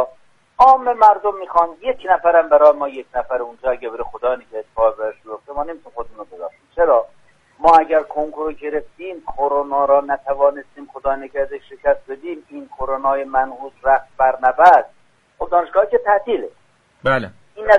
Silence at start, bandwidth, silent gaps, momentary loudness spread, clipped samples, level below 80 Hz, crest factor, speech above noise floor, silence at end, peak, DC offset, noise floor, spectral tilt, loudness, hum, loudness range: 0 s; 7.4 kHz; none; 19 LU; under 0.1%; -46 dBFS; 18 dB; 32 dB; 0 s; 0 dBFS; under 0.1%; -49 dBFS; -6 dB/octave; -17 LUFS; none; 7 LU